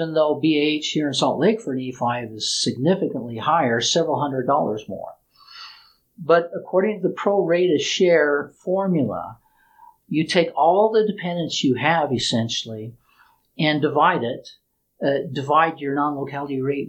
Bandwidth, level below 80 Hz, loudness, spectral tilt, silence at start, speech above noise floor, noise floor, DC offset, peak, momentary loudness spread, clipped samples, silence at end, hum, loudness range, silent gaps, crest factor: 9.6 kHz; -64 dBFS; -21 LUFS; -4.5 dB/octave; 0 s; 37 dB; -58 dBFS; under 0.1%; -2 dBFS; 11 LU; under 0.1%; 0 s; none; 3 LU; none; 18 dB